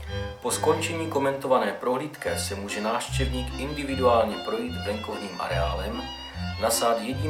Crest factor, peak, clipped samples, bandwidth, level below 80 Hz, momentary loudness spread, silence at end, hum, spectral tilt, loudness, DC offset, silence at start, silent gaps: 18 dB; -8 dBFS; under 0.1%; 17 kHz; -40 dBFS; 9 LU; 0 s; none; -4.5 dB/octave; -27 LUFS; under 0.1%; 0 s; none